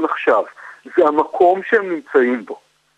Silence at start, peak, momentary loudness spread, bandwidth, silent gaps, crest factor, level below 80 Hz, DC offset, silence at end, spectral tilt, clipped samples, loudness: 0 s; -2 dBFS; 14 LU; 8.4 kHz; none; 16 dB; -64 dBFS; under 0.1%; 0.4 s; -6 dB/octave; under 0.1%; -17 LUFS